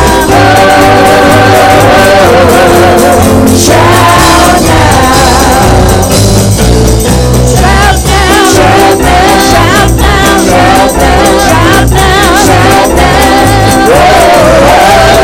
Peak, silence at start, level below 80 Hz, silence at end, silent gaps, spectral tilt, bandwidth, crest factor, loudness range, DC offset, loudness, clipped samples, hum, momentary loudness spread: 0 dBFS; 0 s; -14 dBFS; 0 s; none; -4.5 dB/octave; 17.5 kHz; 4 dB; 2 LU; under 0.1%; -3 LUFS; 3%; none; 3 LU